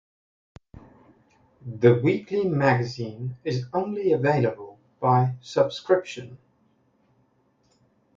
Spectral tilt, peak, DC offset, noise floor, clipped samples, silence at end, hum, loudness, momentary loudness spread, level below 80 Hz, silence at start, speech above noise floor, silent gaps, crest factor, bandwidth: -7.5 dB/octave; -6 dBFS; under 0.1%; -66 dBFS; under 0.1%; 1.8 s; none; -24 LUFS; 19 LU; -62 dBFS; 1.65 s; 43 dB; none; 20 dB; 7.6 kHz